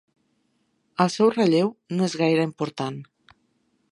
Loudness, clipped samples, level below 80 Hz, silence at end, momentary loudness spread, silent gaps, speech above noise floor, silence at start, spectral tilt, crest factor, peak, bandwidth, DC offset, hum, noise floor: -23 LUFS; under 0.1%; -72 dBFS; 0.9 s; 12 LU; none; 48 dB; 1 s; -6 dB/octave; 22 dB; -2 dBFS; 11.5 kHz; under 0.1%; none; -70 dBFS